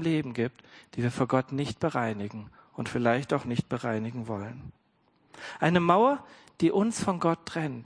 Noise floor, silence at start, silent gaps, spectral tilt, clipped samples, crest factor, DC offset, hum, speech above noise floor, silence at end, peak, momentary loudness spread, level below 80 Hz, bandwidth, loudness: -68 dBFS; 0 s; none; -6.5 dB/octave; under 0.1%; 22 dB; under 0.1%; none; 40 dB; 0 s; -6 dBFS; 16 LU; -62 dBFS; 10.5 kHz; -28 LUFS